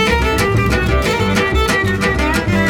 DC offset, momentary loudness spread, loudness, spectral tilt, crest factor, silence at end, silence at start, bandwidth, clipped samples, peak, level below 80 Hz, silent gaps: under 0.1%; 1 LU; -15 LUFS; -5 dB/octave; 14 dB; 0 s; 0 s; 18 kHz; under 0.1%; 0 dBFS; -22 dBFS; none